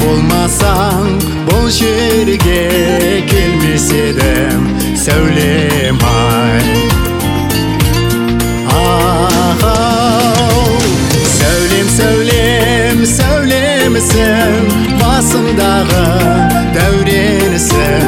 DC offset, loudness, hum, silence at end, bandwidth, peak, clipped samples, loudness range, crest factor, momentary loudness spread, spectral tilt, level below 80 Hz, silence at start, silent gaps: 0.3%; -10 LUFS; none; 0 s; 17 kHz; 0 dBFS; under 0.1%; 2 LU; 10 dB; 3 LU; -4.5 dB/octave; -20 dBFS; 0 s; none